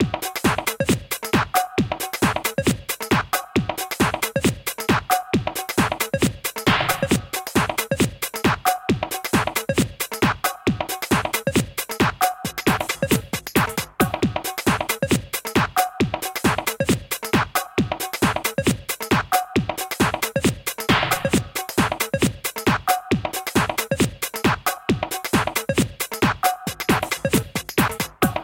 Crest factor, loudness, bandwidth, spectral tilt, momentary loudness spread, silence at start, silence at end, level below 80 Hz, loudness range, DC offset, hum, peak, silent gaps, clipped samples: 20 dB; -22 LUFS; 17 kHz; -4 dB/octave; 4 LU; 0 s; 0 s; -42 dBFS; 1 LU; under 0.1%; none; -2 dBFS; none; under 0.1%